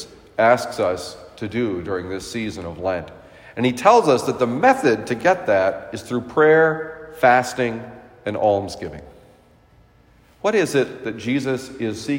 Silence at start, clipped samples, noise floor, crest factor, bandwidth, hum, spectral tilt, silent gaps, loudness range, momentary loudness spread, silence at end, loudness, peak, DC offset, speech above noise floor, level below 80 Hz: 0 s; under 0.1%; -53 dBFS; 20 dB; 16 kHz; none; -5.5 dB/octave; none; 7 LU; 16 LU; 0 s; -20 LUFS; 0 dBFS; under 0.1%; 34 dB; -56 dBFS